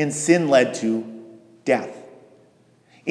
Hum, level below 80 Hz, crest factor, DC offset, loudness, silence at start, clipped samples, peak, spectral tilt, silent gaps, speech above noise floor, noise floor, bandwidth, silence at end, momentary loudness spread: none; -80 dBFS; 20 dB; under 0.1%; -21 LUFS; 0 s; under 0.1%; -2 dBFS; -4.5 dB/octave; none; 37 dB; -57 dBFS; 11 kHz; 0 s; 22 LU